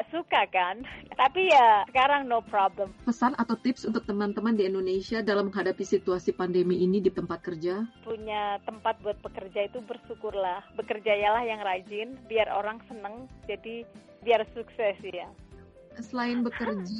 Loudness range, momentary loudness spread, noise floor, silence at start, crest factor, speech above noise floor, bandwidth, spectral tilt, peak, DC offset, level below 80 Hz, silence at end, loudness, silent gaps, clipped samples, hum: 9 LU; 14 LU; -51 dBFS; 0 s; 18 dB; 23 dB; 8.6 kHz; -5.5 dB/octave; -10 dBFS; under 0.1%; -58 dBFS; 0 s; -28 LUFS; none; under 0.1%; none